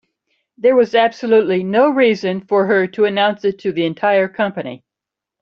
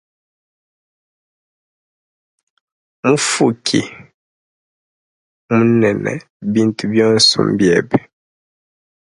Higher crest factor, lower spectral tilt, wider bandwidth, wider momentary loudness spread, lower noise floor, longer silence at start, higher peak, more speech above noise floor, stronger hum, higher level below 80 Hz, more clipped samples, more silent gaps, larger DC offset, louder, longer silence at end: about the same, 14 dB vs 18 dB; first, -6.5 dB/octave vs -4.5 dB/octave; second, 7 kHz vs 11.5 kHz; second, 7 LU vs 10 LU; second, -85 dBFS vs under -90 dBFS; second, 0.65 s vs 3.05 s; about the same, -2 dBFS vs 0 dBFS; second, 70 dB vs over 76 dB; neither; second, -64 dBFS vs -56 dBFS; neither; second, none vs 4.14-5.49 s, 6.30-6.40 s; neither; about the same, -16 LUFS vs -15 LUFS; second, 0.65 s vs 1.05 s